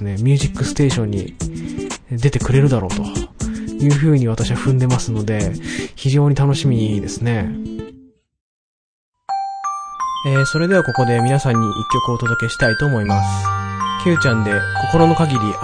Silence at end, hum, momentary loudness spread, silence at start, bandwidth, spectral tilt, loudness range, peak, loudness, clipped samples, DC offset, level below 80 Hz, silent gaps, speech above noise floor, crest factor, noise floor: 0 s; none; 11 LU; 0 s; 10.5 kHz; -6 dB/octave; 5 LU; 0 dBFS; -18 LUFS; under 0.1%; under 0.1%; -36 dBFS; 8.41-9.13 s; 30 dB; 18 dB; -46 dBFS